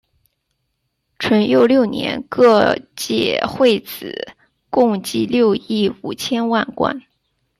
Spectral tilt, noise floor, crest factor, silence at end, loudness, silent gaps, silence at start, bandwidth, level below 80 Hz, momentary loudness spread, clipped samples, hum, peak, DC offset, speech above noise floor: -5 dB/octave; -72 dBFS; 16 dB; 0.6 s; -17 LUFS; none; 1.2 s; 15 kHz; -56 dBFS; 12 LU; under 0.1%; none; -2 dBFS; under 0.1%; 55 dB